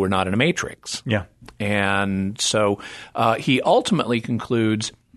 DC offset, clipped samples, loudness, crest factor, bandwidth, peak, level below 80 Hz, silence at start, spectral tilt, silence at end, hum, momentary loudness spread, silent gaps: under 0.1%; under 0.1%; -21 LUFS; 18 dB; 12.5 kHz; -2 dBFS; -54 dBFS; 0 s; -4.5 dB/octave; 0.25 s; none; 9 LU; none